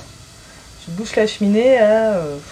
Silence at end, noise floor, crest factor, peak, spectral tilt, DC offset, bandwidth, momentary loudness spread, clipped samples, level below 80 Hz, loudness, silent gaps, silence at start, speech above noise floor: 0 s; -41 dBFS; 14 dB; -4 dBFS; -5.5 dB/octave; under 0.1%; 13.5 kHz; 17 LU; under 0.1%; -48 dBFS; -16 LUFS; none; 0 s; 25 dB